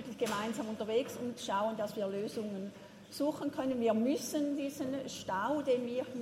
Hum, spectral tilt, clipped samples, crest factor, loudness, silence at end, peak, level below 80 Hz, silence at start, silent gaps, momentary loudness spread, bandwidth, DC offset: none; -4.5 dB/octave; under 0.1%; 16 dB; -36 LUFS; 0 s; -20 dBFS; -76 dBFS; 0 s; none; 8 LU; 16 kHz; under 0.1%